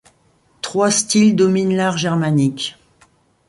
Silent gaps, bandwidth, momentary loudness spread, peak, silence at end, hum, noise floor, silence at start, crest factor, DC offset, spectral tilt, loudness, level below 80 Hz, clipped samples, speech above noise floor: none; 11.5 kHz; 12 LU; -4 dBFS; 0.75 s; none; -57 dBFS; 0.65 s; 14 dB; under 0.1%; -4.5 dB/octave; -16 LUFS; -58 dBFS; under 0.1%; 42 dB